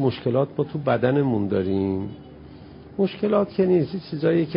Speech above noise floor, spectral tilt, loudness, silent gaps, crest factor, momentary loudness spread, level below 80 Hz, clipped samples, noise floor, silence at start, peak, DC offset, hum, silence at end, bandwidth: 21 dB; -12.5 dB/octave; -23 LUFS; none; 16 dB; 21 LU; -50 dBFS; under 0.1%; -43 dBFS; 0 s; -6 dBFS; under 0.1%; none; 0 s; 5.4 kHz